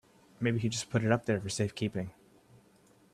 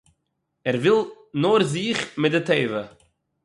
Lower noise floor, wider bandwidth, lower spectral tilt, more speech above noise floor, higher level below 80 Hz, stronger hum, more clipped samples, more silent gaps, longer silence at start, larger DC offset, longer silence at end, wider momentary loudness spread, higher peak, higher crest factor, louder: second, -63 dBFS vs -76 dBFS; first, 13 kHz vs 11.5 kHz; about the same, -5.5 dB/octave vs -5.5 dB/octave; second, 32 dB vs 55 dB; about the same, -64 dBFS vs -64 dBFS; neither; neither; neither; second, 0.4 s vs 0.65 s; neither; first, 1 s vs 0.55 s; second, 7 LU vs 11 LU; second, -14 dBFS vs -6 dBFS; about the same, 20 dB vs 18 dB; second, -32 LUFS vs -22 LUFS